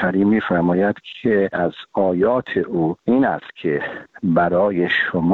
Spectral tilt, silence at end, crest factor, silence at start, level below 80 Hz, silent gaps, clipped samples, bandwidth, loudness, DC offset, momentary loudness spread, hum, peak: -9 dB/octave; 0 s; 14 dB; 0 s; -54 dBFS; none; under 0.1%; 4.4 kHz; -19 LUFS; under 0.1%; 7 LU; none; -4 dBFS